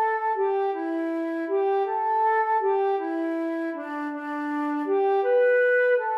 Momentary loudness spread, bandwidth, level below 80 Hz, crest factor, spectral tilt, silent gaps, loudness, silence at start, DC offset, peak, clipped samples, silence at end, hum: 10 LU; 5.6 kHz; under -90 dBFS; 12 dB; -4.5 dB/octave; none; -25 LUFS; 0 s; under 0.1%; -12 dBFS; under 0.1%; 0 s; none